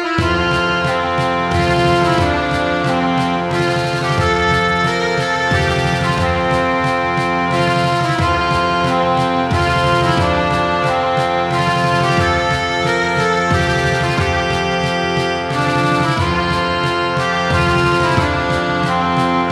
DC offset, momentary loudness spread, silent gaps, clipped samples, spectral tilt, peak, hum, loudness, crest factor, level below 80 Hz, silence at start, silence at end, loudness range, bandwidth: under 0.1%; 3 LU; none; under 0.1%; -5.5 dB/octave; -2 dBFS; none; -15 LUFS; 14 dB; -34 dBFS; 0 s; 0 s; 1 LU; 14 kHz